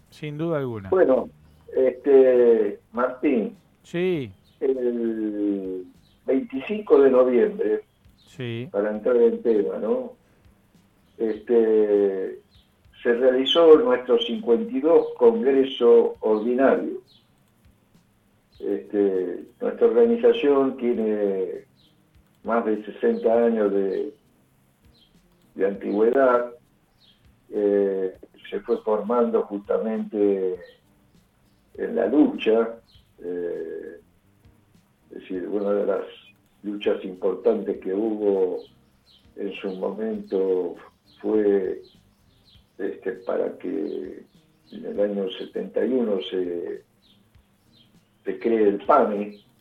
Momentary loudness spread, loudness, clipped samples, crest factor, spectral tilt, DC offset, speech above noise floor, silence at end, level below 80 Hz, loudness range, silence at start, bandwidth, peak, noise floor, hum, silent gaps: 16 LU; -22 LUFS; under 0.1%; 20 dB; -7.5 dB/octave; under 0.1%; 40 dB; 0.25 s; -64 dBFS; 8 LU; 0.2 s; 6.4 kHz; -2 dBFS; -62 dBFS; none; none